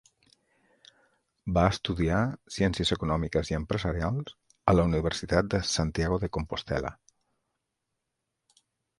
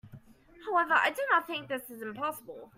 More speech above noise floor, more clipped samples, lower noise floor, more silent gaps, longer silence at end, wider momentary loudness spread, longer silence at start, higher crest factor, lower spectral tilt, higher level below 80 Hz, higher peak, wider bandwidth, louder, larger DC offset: first, 56 dB vs 24 dB; neither; first, -83 dBFS vs -55 dBFS; neither; first, 2.05 s vs 0.1 s; second, 8 LU vs 15 LU; first, 1.45 s vs 0.05 s; about the same, 24 dB vs 20 dB; first, -5.5 dB/octave vs -3.5 dB/octave; first, -42 dBFS vs -70 dBFS; first, -6 dBFS vs -12 dBFS; second, 11.5 kHz vs 16 kHz; about the same, -28 LUFS vs -30 LUFS; neither